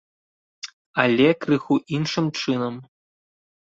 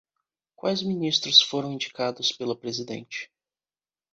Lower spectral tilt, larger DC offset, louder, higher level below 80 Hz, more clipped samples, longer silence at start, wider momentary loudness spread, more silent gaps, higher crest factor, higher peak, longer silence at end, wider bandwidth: first, -6 dB/octave vs -3 dB/octave; neither; about the same, -22 LUFS vs -24 LUFS; first, -64 dBFS vs -72 dBFS; neither; about the same, 0.65 s vs 0.65 s; first, 20 LU vs 17 LU; first, 0.73-0.94 s vs none; about the same, 22 dB vs 26 dB; about the same, -2 dBFS vs -2 dBFS; about the same, 0.85 s vs 0.9 s; about the same, 7.8 kHz vs 8.2 kHz